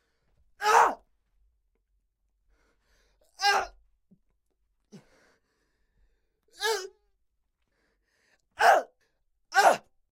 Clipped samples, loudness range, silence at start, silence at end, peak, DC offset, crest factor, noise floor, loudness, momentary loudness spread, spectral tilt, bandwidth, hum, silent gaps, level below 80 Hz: under 0.1%; 11 LU; 0.6 s; 0.35 s; -8 dBFS; under 0.1%; 24 dB; -76 dBFS; -25 LUFS; 19 LU; -0.5 dB/octave; 16.5 kHz; none; none; -68 dBFS